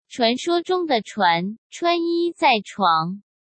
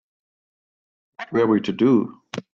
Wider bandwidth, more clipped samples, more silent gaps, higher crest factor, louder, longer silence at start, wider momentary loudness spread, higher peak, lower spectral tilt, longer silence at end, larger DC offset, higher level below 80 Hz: first, 8.8 kHz vs 7.4 kHz; neither; first, 1.58-1.70 s vs none; about the same, 16 dB vs 16 dB; about the same, -21 LUFS vs -20 LUFS; second, 0.1 s vs 1.2 s; second, 6 LU vs 16 LU; about the same, -4 dBFS vs -6 dBFS; second, -4.5 dB/octave vs -7.5 dB/octave; first, 0.35 s vs 0.1 s; neither; second, -74 dBFS vs -66 dBFS